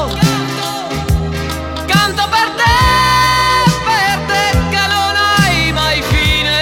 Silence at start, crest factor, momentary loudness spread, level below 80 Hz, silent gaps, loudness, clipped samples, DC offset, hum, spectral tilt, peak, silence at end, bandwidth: 0 s; 12 dB; 9 LU; -24 dBFS; none; -12 LUFS; under 0.1%; under 0.1%; none; -4 dB/octave; 0 dBFS; 0 s; 18 kHz